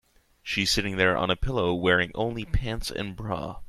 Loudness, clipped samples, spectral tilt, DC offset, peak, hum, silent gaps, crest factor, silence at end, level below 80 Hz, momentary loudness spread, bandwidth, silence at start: -26 LUFS; under 0.1%; -4.5 dB/octave; under 0.1%; -6 dBFS; none; none; 20 dB; 0 s; -38 dBFS; 10 LU; 14.5 kHz; 0.45 s